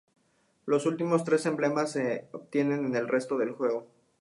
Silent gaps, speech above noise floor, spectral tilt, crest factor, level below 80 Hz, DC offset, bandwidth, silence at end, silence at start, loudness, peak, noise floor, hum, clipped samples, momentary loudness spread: none; 42 dB; -6 dB/octave; 18 dB; -78 dBFS; under 0.1%; 11.5 kHz; 0.35 s; 0.65 s; -29 LUFS; -12 dBFS; -70 dBFS; none; under 0.1%; 7 LU